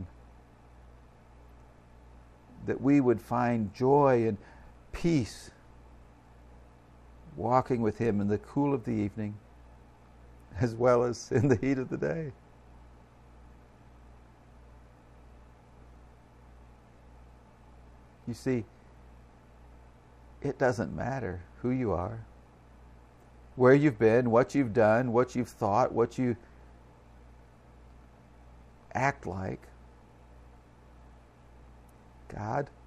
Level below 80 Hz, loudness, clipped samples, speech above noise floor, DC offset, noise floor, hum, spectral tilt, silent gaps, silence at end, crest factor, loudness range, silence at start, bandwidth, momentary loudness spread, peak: -56 dBFS; -29 LUFS; under 0.1%; 27 dB; under 0.1%; -55 dBFS; 60 Hz at -55 dBFS; -7.5 dB/octave; none; 0.2 s; 22 dB; 15 LU; 0 s; 13 kHz; 18 LU; -10 dBFS